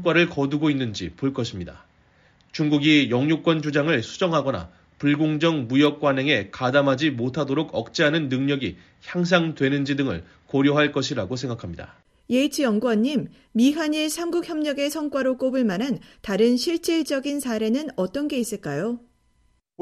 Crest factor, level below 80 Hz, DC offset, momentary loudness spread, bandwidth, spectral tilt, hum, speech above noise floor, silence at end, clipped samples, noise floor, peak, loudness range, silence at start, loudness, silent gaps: 18 dB; -56 dBFS; under 0.1%; 9 LU; 14 kHz; -5.5 dB/octave; none; 42 dB; 0.85 s; under 0.1%; -64 dBFS; -4 dBFS; 2 LU; 0 s; -23 LUFS; none